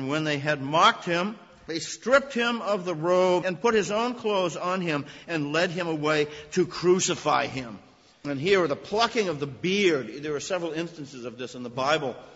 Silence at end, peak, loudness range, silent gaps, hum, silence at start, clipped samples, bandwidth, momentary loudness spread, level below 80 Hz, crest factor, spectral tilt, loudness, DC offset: 0 s; -6 dBFS; 2 LU; none; none; 0 s; under 0.1%; 8 kHz; 12 LU; -62 dBFS; 20 dB; -4 dB/octave; -26 LUFS; under 0.1%